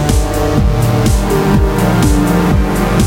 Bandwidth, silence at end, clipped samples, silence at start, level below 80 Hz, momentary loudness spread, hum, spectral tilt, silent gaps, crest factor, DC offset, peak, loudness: 16.5 kHz; 0 s; under 0.1%; 0 s; -16 dBFS; 2 LU; none; -6 dB/octave; none; 10 dB; under 0.1%; 0 dBFS; -12 LUFS